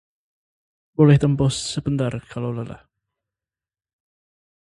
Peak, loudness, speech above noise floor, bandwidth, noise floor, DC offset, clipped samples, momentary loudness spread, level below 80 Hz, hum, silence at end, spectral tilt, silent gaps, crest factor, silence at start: -2 dBFS; -20 LUFS; over 71 dB; 11.5 kHz; under -90 dBFS; under 0.1%; under 0.1%; 16 LU; -48 dBFS; none; 1.9 s; -6.5 dB/octave; none; 22 dB; 1 s